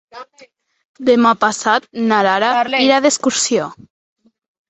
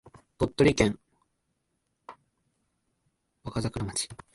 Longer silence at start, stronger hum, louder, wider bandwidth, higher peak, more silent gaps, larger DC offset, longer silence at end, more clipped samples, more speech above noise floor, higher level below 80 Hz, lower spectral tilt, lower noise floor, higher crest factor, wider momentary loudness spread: second, 0.15 s vs 0.4 s; neither; first, -14 LUFS vs -28 LUFS; second, 8.4 kHz vs 11.5 kHz; first, -2 dBFS vs -8 dBFS; first, 0.85-0.94 s vs none; neither; first, 0.95 s vs 0.2 s; neither; second, 34 dB vs 51 dB; second, -62 dBFS vs -50 dBFS; second, -2.5 dB/octave vs -5 dB/octave; second, -49 dBFS vs -78 dBFS; second, 16 dB vs 24 dB; second, 5 LU vs 16 LU